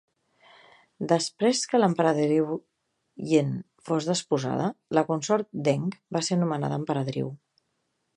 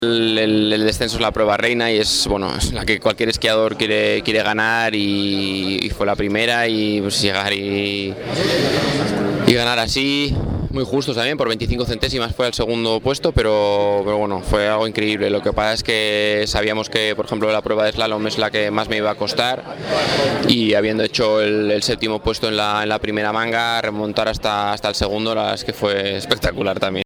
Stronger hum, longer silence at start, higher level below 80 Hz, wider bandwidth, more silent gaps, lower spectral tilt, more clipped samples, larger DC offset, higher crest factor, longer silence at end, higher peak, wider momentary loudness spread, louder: neither; first, 1 s vs 0 s; second, -70 dBFS vs -36 dBFS; second, 11 kHz vs 17.5 kHz; neither; about the same, -5.5 dB/octave vs -4.5 dB/octave; neither; neither; about the same, 20 dB vs 18 dB; first, 0.8 s vs 0 s; second, -6 dBFS vs 0 dBFS; first, 9 LU vs 4 LU; second, -26 LUFS vs -18 LUFS